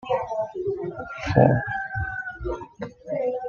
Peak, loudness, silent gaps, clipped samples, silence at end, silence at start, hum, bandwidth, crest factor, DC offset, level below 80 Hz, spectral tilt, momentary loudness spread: -2 dBFS; -26 LUFS; none; under 0.1%; 0 s; 0 s; none; 7 kHz; 24 dB; under 0.1%; -44 dBFS; -8 dB/octave; 14 LU